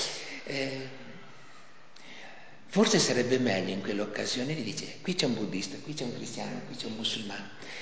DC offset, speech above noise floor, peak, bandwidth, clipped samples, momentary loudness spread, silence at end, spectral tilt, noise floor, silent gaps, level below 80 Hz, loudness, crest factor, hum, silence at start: 0.5%; 24 dB; -10 dBFS; 8 kHz; under 0.1%; 23 LU; 0 s; -3.5 dB/octave; -55 dBFS; none; -72 dBFS; -31 LUFS; 22 dB; none; 0 s